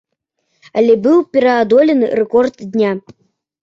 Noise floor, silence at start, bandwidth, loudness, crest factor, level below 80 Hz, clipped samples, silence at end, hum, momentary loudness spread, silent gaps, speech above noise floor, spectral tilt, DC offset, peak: -70 dBFS; 0.75 s; 7.4 kHz; -13 LUFS; 12 dB; -58 dBFS; under 0.1%; 0.65 s; none; 7 LU; none; 57 dB; -7 dB/octave; under 0.1%; -2 dBFS